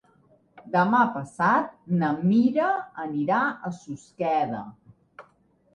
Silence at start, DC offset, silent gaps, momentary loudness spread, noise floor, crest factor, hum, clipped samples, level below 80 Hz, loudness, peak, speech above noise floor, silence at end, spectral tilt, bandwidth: 0.55 s; under 0.1%; none; 14 LU; -63 dBFS; 18 dB; none; under 0.1%; -68 dBFS; -24 LUFS; -8 dBFS; 39 dB; 0.55 s; -7.5 dB/octave; 9.6 kHz